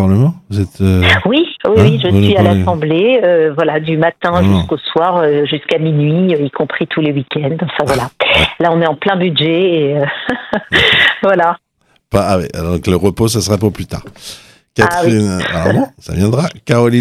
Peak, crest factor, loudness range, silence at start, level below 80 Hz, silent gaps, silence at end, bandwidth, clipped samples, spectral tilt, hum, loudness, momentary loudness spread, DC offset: 0 dBFS; 12 dB; 4 LU; 0 s; -40 dBFS; none; 0 s; 14.5 kHz; under 0.1%; -6 dB/octave; none; -12 LUFS; 8 LU; under 0.1%